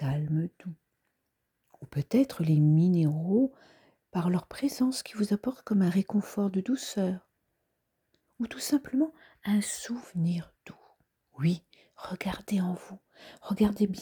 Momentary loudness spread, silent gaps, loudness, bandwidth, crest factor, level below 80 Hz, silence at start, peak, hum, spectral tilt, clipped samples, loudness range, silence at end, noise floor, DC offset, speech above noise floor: 13 LU; none; -29 LUFS; over 20 kHz; 16 dB; -62 dBFS; 0 s; -14 dBFS; none; -6.5 dB/octave; under 0.1%; 6 LU; 0 s; -80 dBFS; under 0.1%; 52 dB